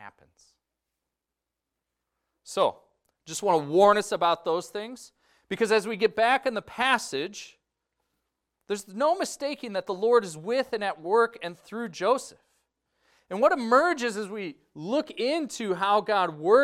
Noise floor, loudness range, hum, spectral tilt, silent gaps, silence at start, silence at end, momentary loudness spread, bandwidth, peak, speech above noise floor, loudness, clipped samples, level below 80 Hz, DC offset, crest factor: -87 dBFS; 5 LU; none; -3.5 dB/octave; none; 0 s; 0 s; 15 LU; 15 kHz; -6 dBFS; 61 dB; -26 LUFS; under 0.1%; -72 dBFS; under 0.1%; 22 dB